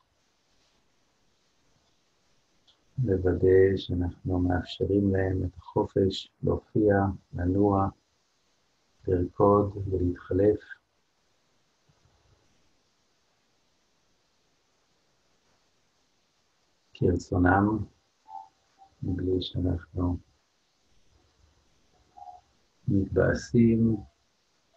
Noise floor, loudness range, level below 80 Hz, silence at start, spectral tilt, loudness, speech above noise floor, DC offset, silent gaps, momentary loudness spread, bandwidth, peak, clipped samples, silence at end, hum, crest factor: -72 dBFS; 9 LU; -50 dBFS; 3 s; -8 dB/octave; -27 LUFS; 47 dB; under 0.1%; none; 17 LU; 7.8 kHz; -8 dBFS; under 0.1%; 0.75 s; none; 22 dB